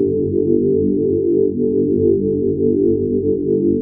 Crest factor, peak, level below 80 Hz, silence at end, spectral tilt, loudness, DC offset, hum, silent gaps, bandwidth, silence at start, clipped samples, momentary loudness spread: 12 dB; -4 dBFS; -44 dBFS; 0 s; -19 dB/octave; -17 LUFS; under 0.1%; 50 Hz at -35 dBFS; none; 0.9 kHz; 0 s; under 0.1%; 2 LU